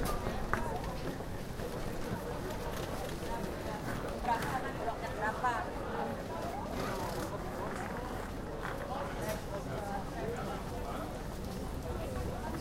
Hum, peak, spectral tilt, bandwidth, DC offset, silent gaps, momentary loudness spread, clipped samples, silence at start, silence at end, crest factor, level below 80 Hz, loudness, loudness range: none; -14 dBFS; -5.5 dB/octave; 16 kHz; under 0.1%; none; 6 LU; under 0.1%; 0 s; 0 s; 22 dB; -46 dBFS; -38 LUFS; 3 LU